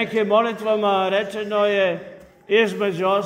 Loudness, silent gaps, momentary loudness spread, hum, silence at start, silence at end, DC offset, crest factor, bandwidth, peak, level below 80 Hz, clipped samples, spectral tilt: -20 LUFS; none; 5 LU; none; 0 s; 0 s; under 0.1%; 16 dB; 15.5 kHz; -4 dBFS; -66 dBFS; under 0.1%; -5.5 dB/octave